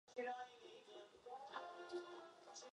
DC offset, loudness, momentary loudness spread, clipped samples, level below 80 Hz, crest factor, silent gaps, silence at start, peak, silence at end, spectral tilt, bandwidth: under 0.1%; -54 LUFS; 11 LU; under 0.1%; under -90 dBFS; 18 dB; none; 0.05 s; -36 dBFS; 0 s; -2 dB/octave; 11 kHz